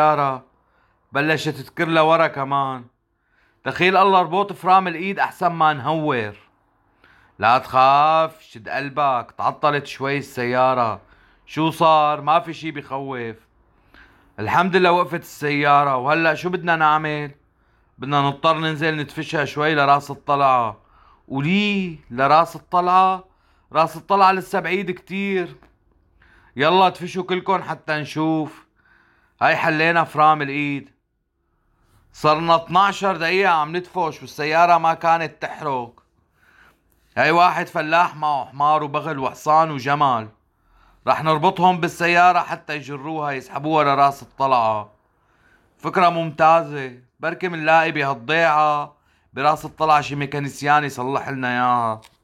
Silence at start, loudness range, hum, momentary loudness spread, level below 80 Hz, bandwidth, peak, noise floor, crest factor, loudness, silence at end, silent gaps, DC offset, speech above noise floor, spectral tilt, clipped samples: 0 s; 3 LU; none; 12 LU; -60 dBFS; 16 kHz; -4 dBFS; -71 dBFS; 16 dB; -19 LUFS; 0.25 s; none; under 0.1%; 52 dB; -5.5 dB/octave; under 0.1%